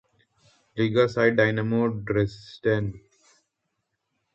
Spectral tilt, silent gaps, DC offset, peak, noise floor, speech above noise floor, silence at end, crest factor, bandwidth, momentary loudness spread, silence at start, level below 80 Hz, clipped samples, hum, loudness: -7.5 dB/octave; none; under 0.1%; -8 dBFS; -79 dBFS; 55 dB; 1.35 s; 20 dB; 7.8 kHz; 9 LU; 0.75 s; -56 dBFS; under 0.1%; none; -24 LUFS